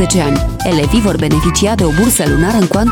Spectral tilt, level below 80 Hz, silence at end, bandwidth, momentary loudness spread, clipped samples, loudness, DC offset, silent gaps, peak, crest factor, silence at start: -5 dB/octave; -22 dBFS; 0 s; 19 kHz; 4 LU; under 0.1%; -12 LUFS; under 0.1%; none; 0 dBFS; 12 dB; 0 s